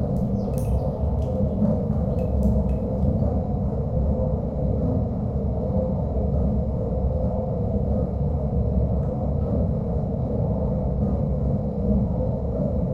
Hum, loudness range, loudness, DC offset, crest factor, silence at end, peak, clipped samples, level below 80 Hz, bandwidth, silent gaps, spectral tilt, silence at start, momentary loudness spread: none; 1 LU; -24 LUFS; under 0.1%; 14 dB; 0 s; -10 dBFS; under 0.1%; -28 dBFS; 2.7 kHz; none; -11.5 dB/octave; 0 s; 3 LU